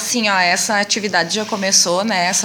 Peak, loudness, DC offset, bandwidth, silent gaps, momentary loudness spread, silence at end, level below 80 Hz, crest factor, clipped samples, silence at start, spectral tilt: 0 dBFS; -15 LUFS; under 0.1%; 17 kHz; none; 4 LU; 0 s; -68 dBFS; 16 dB; under 0.1%; 0 s; -1.5 dB/octave